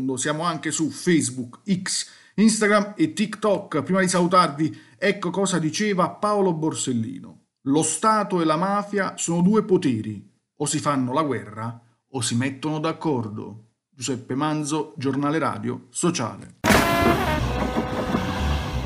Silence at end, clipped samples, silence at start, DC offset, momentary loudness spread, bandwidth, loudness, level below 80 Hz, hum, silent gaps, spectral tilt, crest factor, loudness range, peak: 0 s; under 0.1%; 0 s; under 0.1%; 11 LU; 15.5 kHz; -23 LUFS; -40 dBFS; none; none; -4.5 dB/octave; 20 dB; 5 LU; -4 dBFS